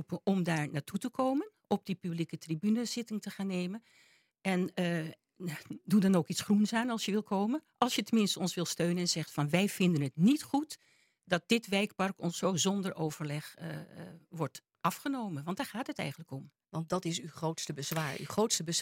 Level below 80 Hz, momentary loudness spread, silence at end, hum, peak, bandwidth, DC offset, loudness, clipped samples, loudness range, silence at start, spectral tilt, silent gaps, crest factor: -76 dBFS; 13 LU; 0 s; none; -10 dBFS; 16.5 kHz; under 0.1%; -33 LUFS; under 0.1%; 7 LU; 0 s; -5 dB/octave; none; 24 dB